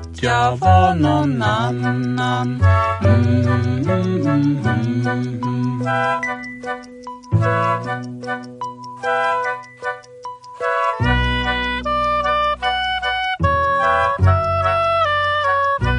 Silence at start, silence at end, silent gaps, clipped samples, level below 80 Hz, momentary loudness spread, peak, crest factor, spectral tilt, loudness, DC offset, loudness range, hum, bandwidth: 0 s; 0 s; none; under 0.1%; -34 dBFS; 12 LU; -2 dBFS; 16 dB; -6.5 dB/octave; -18 LUFS; under 0.1%; 5 LU; none; 10 kHz